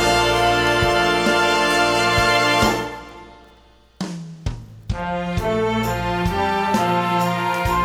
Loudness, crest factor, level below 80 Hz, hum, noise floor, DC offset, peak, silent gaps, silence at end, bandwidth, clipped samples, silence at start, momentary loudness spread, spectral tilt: -18 LUFS; 16 dB; -36 dBFS; none; -51 dBFS; under 0.1%; -4 dBFS; none; 0 s; over 20 kHz; under 0.1%; 0 s; 15 LU; -4 dB/octave